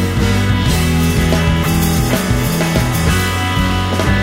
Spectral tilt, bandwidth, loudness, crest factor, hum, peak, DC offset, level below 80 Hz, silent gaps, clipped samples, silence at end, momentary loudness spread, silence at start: -5 dB/octave; 16.5 kHz; -14 LUFS; 12 dB; none; -2 dBFS; under 0.1%; -22 dBFS; none; under 0.1%; 0 s; 2 LU; 0 s